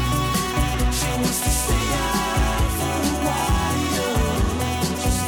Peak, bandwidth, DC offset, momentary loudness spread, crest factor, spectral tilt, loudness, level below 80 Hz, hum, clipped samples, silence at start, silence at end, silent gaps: -8 dBFS; 19 kHz; under 0.1%; 2 LU; 12 dB; -4 dB/octave; -22 LUFS; -26 dBFS; none; under 0.1%; 0 s; 0 s; none